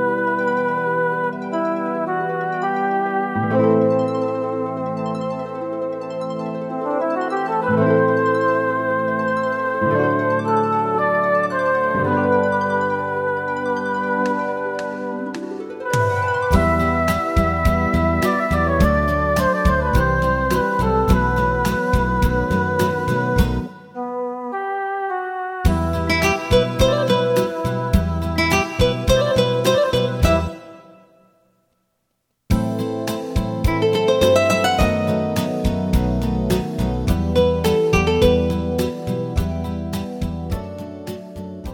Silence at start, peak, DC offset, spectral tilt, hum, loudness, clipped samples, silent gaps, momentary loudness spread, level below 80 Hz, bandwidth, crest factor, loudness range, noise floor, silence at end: 0 s; 0 dBFS; under 0.1%; -6 dB/octave; none; -20 LUFS; under 0.1%; none; 9 LU; -30 dBFS; 18.5 kHz; 18 dB; 5 LU; -72 dBFS; 0 s